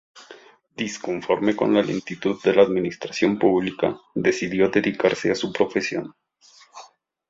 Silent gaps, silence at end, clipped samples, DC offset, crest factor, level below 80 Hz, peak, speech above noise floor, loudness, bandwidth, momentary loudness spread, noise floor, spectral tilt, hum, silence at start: none; 0.45 s; under 0.1%; under 0.1%; 20 dB; -60 dBFS; -4 dBFS; 32 dB; -22 LUFS; 7.8 kHz; 10 LU; -54 dBFS; -5.5 dB/octave; none; 0.15 s